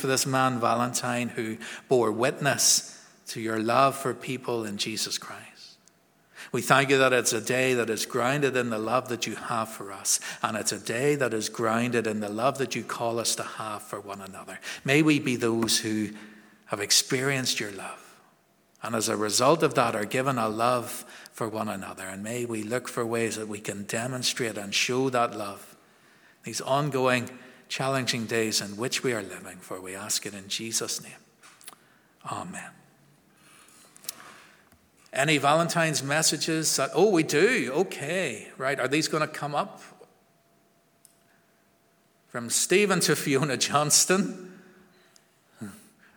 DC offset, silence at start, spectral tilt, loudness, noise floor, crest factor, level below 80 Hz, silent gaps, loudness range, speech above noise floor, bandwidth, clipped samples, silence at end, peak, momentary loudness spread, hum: under 0.1%; 0 s; -3 dB/octave; -26 LUFS; -65 dBFS; 26 dB; -74 dBFS; none; 8 LU; 38 dB; over 20 kHz; under 0.1%; 0.4 s; -2 dBFS; 17 LU; none